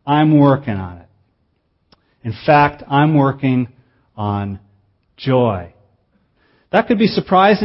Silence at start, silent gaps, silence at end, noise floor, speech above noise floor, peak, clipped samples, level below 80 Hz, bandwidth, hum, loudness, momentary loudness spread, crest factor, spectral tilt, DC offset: 0.05 s; none; 0 s; -64 dBFS; 50 dB; 0 dBFS; under 0.1%; -50 dBFS; 5.8 kHz; none; -16 LUFS; 16 LU; 16 dB; -10 dB/octave; under 0.1%